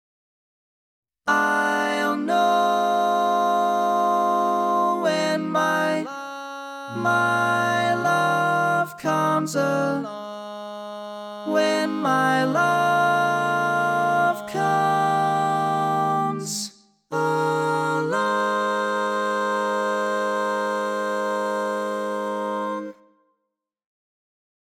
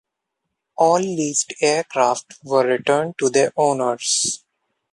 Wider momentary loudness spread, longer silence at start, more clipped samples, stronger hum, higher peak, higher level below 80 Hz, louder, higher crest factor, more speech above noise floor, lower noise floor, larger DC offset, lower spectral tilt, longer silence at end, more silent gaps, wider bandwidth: first, 11 LU vs 5 LU; first, 1.25 s vs 0.8 s; neither; neither; second, -6 dBFS vs -2 dBFS; second, -80 dBFS vs -68 dBFS; second, -22 LUFS vs -19 LUFS; about the same, 16 dB vs 18 dB; about the same, 59 dB vs 60 dB; about the same, -80 dBFS vs -79 dBFS; neither; first, -4.5 dB/octave vs -3 dB/octave; first, 1.7 s vs 0.55 s; neither; first, 18 kHz vs 11.5 kHz